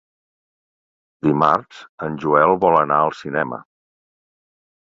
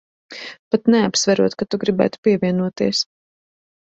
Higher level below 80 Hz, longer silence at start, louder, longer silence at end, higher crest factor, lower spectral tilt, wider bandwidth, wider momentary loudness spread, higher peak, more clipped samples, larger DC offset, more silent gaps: about the same, -58 dBFS vs -58 dBFS; first, 1.25 s vs 0.3 s; about the same, -18 LUFS vs -19 LUFS; first, 1.25 s vs 0.95 s; about the same, 20 dB vs 18 dB; first, -7.5 dB/octave vs -4.5 dB/octave; about the same, 7.6 kHz vs 8.2 kHz; second, 13 LU vs 18 LU; about the same, -2 dBFS vs -2 dBFS; neither; neither; second, 1.89-1.98 s vs 0.59-0.71 s, 2.18-2.23 s